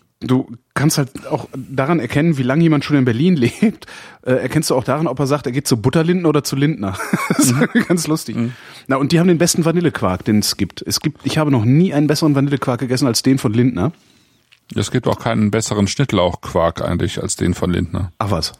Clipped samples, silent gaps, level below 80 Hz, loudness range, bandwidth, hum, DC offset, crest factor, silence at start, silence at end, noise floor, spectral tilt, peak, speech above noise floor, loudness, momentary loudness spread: under 0.1%; none; -44 dBFS; 2 LU; 16 kHz; none; under 0.1%; 16 dB; 0.2 s; 0.1 s; -54 dBFS; -5.5 dB/octave; -2 dBFS; 38 dB; -17 LUFS; 8 LU